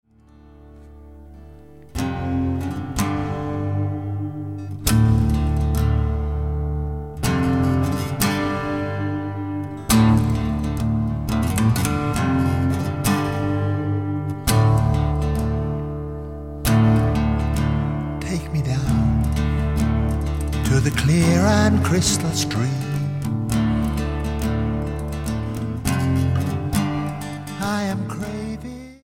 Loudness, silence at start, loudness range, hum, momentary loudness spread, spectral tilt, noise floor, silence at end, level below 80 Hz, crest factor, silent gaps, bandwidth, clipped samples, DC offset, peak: -22 LUFS; 0.35 s; 5 LU; none; 10 LU; -6 dB/octave; -49 dBFS; 0.05 s; -30 dBFS; 18 dB; none; 16.5 kHz; under 0.1%; 0.4%; -2 dBFS